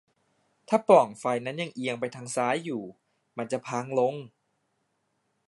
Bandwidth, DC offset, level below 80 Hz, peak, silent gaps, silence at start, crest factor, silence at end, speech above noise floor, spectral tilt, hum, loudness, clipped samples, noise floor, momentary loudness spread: 11.5 kHz; under 0.1%; -76 dBFS; -4 dBFS; none; 0.7 s; 24 dB; 1.2 s; 49 dB; -5 dB/octave; none; -27 LUFS; under 0.1%; -75 dBFS; 17 LU